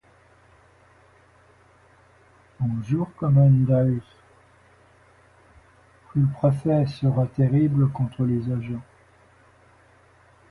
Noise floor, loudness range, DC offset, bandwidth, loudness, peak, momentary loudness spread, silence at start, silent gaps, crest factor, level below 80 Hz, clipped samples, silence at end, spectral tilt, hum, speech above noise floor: -56 dBFS; 4 LU; under 0.1%; 4.8 kHz; -22 LUFS; -8 dBFS; 12 LU; 2.6 s; none; 18 dB; -52 dBFS; under 0.1%; 1.7 s; -10.5 dB/octave; none; 35 dB